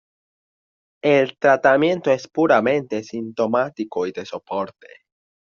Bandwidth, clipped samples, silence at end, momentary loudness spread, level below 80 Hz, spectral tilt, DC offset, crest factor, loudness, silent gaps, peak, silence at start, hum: 7.2 kHz; under 0.1%; 0.85 s; 12 LU; -66 dBFS; -4 dB/octave; under 0.1%; 18 dB; -20 LUFS; none; -2 dBFS; 1.05 s; none